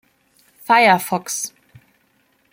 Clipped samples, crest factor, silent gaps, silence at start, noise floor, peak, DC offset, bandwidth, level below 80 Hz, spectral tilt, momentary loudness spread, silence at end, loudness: under 0.1%; 20 dB; none; 0.7 s; -62 dBFS; -2 dBFS; under 0.1%; 16.5 kHz; -70 dBFS; -3 dB/octave; 16 LU; 1.05 s; -17 LUFS